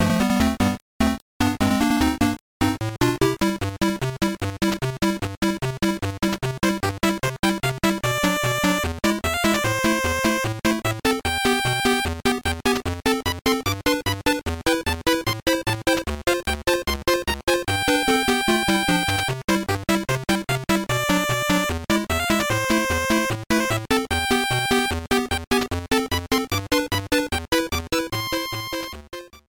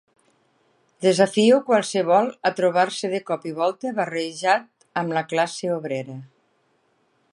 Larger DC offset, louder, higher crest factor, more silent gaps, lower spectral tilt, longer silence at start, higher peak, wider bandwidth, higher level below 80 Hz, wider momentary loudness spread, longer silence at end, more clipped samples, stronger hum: neither; about the same, -22 LUFS vs -22 LUFS; about the same, 16 dB vs 18 dB; first, 0.82-1.00 s, 1.22-1.40 s, 2.41-2.60 s, 5.37-5.42 s, 7.39-7.43 s, 17.43-17.47 s, 19.44-19.48 s, 25.47-25.51 s vs none; about the same, -4 dB/octave vs -4.5 dB/octave; second, 0 s vs 1 s; about the same, -6 dBFS vs -4 dBFS; first, 19.5 kHz vs 11.5 kHz; first, -38 dBFS vs -76 dBFS; second, 4 LU vs 11 LU; second, 0.1 s vs 1.05 s; neither; neither